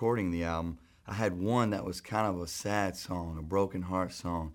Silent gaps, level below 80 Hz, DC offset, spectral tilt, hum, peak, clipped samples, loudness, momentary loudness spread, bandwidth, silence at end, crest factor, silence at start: none; -52 dBFS; under 0.1%; -6 dB/octave; none; -14 dBFS; under 0.1%; -33 LUFS; 8 LU; 18 kHz; 0 s; 18 dB; 0 s